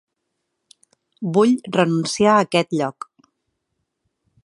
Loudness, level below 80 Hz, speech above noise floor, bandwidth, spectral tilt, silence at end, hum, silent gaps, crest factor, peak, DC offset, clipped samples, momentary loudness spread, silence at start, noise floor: -19 LUFS; -64 dBFS; 59 dB; 11.5 kHz; -5.5 dB/octave; 1.55 s; none; none; 22 dB; 0 dBFS; under 0.1%; under 0.1%; 14 LU; 1.2 s; -76 dBFS